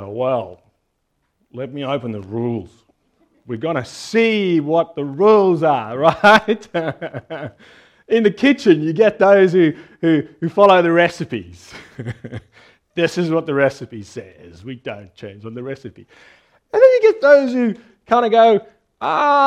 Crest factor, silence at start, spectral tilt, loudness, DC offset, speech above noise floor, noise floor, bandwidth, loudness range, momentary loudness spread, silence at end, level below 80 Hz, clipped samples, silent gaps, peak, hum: 18 dB; 0 s; -6.5 dB/octave; -16 LUFS; under 0.1%; 53 dB; -69 dBFS; 11 kHz; 11 LU; 21 LU; 0 s; -58 dBFS; under 0.1%; none; 0 dBFS; none